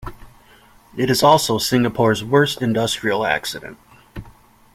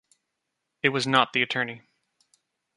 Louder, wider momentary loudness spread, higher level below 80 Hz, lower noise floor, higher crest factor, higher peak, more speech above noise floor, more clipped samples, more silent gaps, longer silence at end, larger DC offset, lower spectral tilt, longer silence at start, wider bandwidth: first, -18 LUFS vs -24 LUFS; first, 24 LU vs 10 LU; first, -46 dBFS vs -72 dBFS; second, -50 dBFS vs -81 dBFS; second, 18 dB vs 24 dB; first, -2 dBFS vs -6 dBFS; second, 32 dB vs 57 dB; neither; neither; second, 0.45 s vs 1 s; neither; about the same, -4.5 dB/octave vs -4 dB/octave; second, 0 s vs 0.85 s; first, 16.5 kHz vs 11.5 kHz